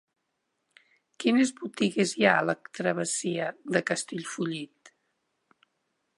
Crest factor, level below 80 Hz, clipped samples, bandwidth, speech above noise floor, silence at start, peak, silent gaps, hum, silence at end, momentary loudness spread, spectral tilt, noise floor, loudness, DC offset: 24 dB; -76 dBFS; under 0.1%; 11.5 kHz; 52 dB; 1.2 s; -6 dBFS; none; none; 1.3 s; 10 LU; -4 dB/octave; -79 dBFS; -28 LUFS; under 0.1%